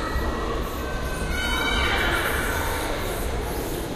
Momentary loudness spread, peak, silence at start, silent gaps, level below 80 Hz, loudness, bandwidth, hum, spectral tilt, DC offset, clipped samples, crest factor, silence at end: 7 LU; -8 dBFS; 0 s; none; -30 dBFS; -25 LUFS; 15.5 kHz; none; -4 dB/octave; under 0.1%; under 0.1%; 16 dB; 0 s